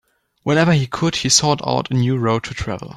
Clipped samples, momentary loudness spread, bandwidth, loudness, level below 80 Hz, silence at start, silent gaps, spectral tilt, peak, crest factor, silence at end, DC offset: under 0.1%; 10 LU; 13 kHz; -17 LUFS; -44 dBFS; 0.45 s; none; -4 dB/octave; 0 dBFS; 18 dB; 0 s; under 0.1%